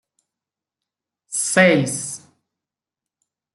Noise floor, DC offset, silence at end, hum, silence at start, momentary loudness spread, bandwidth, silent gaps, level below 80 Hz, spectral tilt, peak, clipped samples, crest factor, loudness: -88 dBFS; under 0.1%; 1.35 s; none; 1.3 s; 16 LU; 12.5 kHz; none; -68 dBFS; -4 dB/octave; -2 dBFS; under 0.1%; 22 dB; -18 LUFS